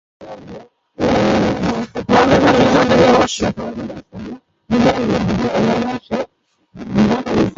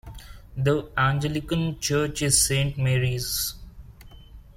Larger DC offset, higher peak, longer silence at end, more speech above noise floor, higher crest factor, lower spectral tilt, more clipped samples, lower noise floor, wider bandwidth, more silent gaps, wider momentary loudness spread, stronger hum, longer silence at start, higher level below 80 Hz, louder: neither; first, -2 dBFS vs -6 dBFS; about the same, 0.05 s vs 0.15 s; first, 41 dB vs 22 dB; second, 14 dB vs 20 dB; first, -6 dB/octave vs -4 dB/octave; neither; first, -56 dBFS vs -46 dBFS; second, 7.8 kHz vs 16.5 kHz; neither; first, 21 LU vs 15 LU; neither; first, 0.2 s vs 0.05 s; about the same, -38 dBFS vs -42 dBFS; first, -15 LUFS vs -24 LUFS